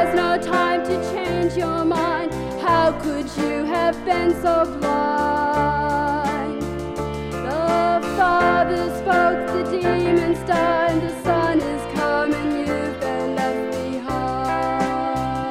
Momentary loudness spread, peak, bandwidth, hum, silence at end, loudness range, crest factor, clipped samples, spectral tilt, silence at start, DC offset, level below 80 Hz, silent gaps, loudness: 7 LU; -6 dBFS; 15.5 kHz; none; 0 s; 3 LU; 14 dB; under 0.1%; -6 dB/octave; 0 s; under 0.1%; -40 dBFS; none; -21 LUFS